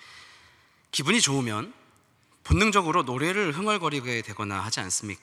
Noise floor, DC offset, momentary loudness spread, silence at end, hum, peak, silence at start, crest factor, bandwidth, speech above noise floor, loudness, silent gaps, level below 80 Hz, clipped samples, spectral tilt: -63 dBFS; under 0.1%; 10 LU; 0.05 s; none; -6 dBFS; 0.05 s; 22 dB; 14.5 kHz; 37 dB; -25 LUFS; none; -44 dBFS; under 0.1%; -3.5 dB/octave